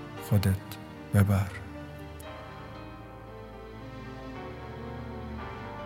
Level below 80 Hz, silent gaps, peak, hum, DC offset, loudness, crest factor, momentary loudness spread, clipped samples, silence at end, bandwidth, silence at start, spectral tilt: -50 dBFS; none; -10 dBFS; none; under 0.1%; -33 LUFS; 24 dB; 18 LU; under 0.1%; 0 s; 16 kHz; 0 s; -7 dB/octave